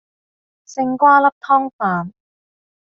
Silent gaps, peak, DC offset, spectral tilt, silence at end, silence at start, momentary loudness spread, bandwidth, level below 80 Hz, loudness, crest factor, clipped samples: 1.32-1.41 s, 1.73-1.79 s; -2 dBFS; under 0.1%; -5.5 dB/octave; 0.8 s; 0.7 s; 15 LU; 7.4 kHz; -68 dBFS; -16 LUFS; 16 dB; under 0.1%